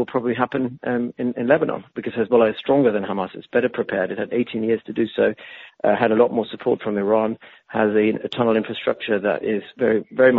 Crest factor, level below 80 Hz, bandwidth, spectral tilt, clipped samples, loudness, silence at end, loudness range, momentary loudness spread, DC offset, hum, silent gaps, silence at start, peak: 18 dB; -62 dBFS; 5 kHz; -4.5 dB/octave; under 0.1%; -21 LUFS; 0 s; 1 LU; 8 LU; under 0.1%; none; none; 0 s; -2 dBFS